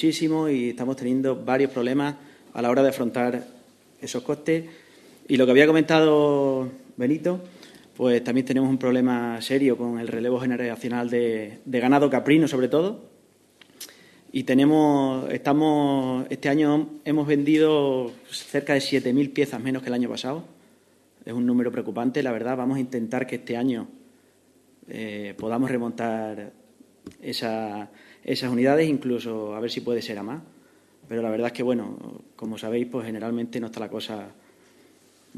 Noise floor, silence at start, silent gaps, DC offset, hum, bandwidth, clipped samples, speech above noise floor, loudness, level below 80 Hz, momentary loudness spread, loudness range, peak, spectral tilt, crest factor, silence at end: -59 dBFS; 0 s; none; under 0.1%; none; 13.5 kHz; under 0.1%; 36 dB; -24 LUFS; -70 dBFS; 15 LU; 9 LU; -2 dBFS; -6 dB/octave; 22 dB; 1.05 s